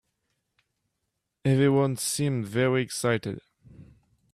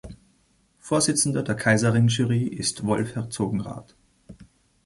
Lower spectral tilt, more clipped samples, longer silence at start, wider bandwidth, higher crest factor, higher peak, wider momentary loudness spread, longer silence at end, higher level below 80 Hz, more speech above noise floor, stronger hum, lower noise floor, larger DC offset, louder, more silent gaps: about the same, -5.5 dB/octave vs -4.5 dB/octave; neither; first, 1.45 s vs 0.05 s; first, 14.5 kHz vs 11.5 kHz; about the same, 16 dB vs 18 dB; second, -12 dBFS vs -6 dBFS; about the same, 9 LU vs 10 LU; about the same, 0.5 s vs 0.45 s; second, -62 dBFS vs -54 dBFS; first, 56 dB vs 41 dB; neither; first, -81 dBFS vs -64 dBFS; neither; second, -26 LUFS vs -23 LUFS; neither